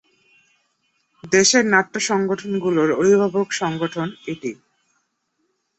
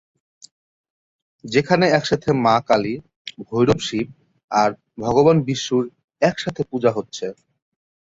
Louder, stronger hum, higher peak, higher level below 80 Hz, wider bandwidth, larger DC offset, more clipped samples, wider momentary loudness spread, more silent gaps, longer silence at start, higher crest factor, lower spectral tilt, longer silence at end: about the same, -19 LUFS vs -20 LUFS; neither; about the same, -2 dBFS vs -2 dBFS; second, -62 dBFS vs -52 dBFS; about the same, 8.2 kHz vs 8 kHz; neither; neither; about the same, 14 LU vs 14 LU; second, none vs 3.16-3.25 s, 4.44-4.48 s, 6.04-6.08 s; second, 1.25 s vs 1.45 s; about the same, 20 dB vs 18 dB; second, -3.5 dB/octave vs -5.5 dB/octave; first, 1.25 s vs 0.8 s